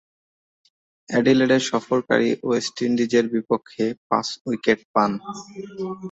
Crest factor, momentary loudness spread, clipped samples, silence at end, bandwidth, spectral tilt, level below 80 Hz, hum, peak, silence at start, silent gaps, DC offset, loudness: 20 dB; 13 LU; under 0.1%; 0 s; 8 kHz; -5 dB/octave; -64 dBFS; none; -4 dBFS; 1.1 s; 3.97-4.10 s, 4.41-4.45 s, 4.85-4.94 s; under 0.1%; -22 LUFS